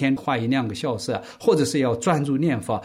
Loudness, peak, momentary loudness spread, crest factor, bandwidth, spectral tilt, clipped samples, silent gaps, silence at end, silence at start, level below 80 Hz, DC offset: -23 LUFS; -8 dBFS; 6 LU; 16 dB; 15.5 kHz; -6 dB/octave; under 0.1%; none; 0 s; 0 s; -60 dBFS; under 0.1%